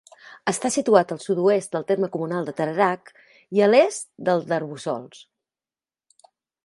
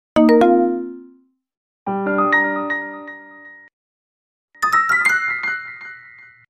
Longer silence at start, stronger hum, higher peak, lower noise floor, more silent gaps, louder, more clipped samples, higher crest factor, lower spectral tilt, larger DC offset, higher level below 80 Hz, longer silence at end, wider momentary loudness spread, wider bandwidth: about the same, 0.25 s vs 0.15 s; neither; first, 0 dBFS vs -4 dBFS; first, under -90 dBFS vs -53 dBFS; second, none vs 1.57-1.86 s, 3.73-4.48 s; second, -22 LUFS vs -17 LUFS; neither; first, 22 dB vs 16 dB; about the same, -5 dB/octave vs -5 dB/octave; neither; second, -72 dBFS vs -58 dBFS; first, 1.45 s vs 0.5 s; second, 12 LU vs 21 LU; second, 11.5 kHz vs 15 kHz